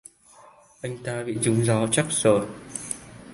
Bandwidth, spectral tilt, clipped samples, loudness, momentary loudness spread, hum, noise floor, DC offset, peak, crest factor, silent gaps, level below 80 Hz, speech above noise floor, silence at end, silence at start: 11.5 kHz; -4.5 dB/octave; under 0.1%; -24 LUFS; 14 LU; none; -52 dBFS; under 0.1%; -6 dBFS; 20 dB; none; -58 dBFS; 29 dB; 0 s; 0.85 s